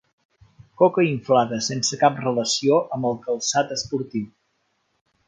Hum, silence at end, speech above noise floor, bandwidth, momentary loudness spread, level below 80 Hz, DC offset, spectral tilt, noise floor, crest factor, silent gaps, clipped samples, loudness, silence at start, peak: none; 1 s; 49 dB; 9.6 kHz; 8 LU; -64 dBFS; under 0.1%; -4 dB/octave; -70 dBFS; 20 dB; none; under 0.1%; -22 LUFS; 0.8 s; -2 dBFS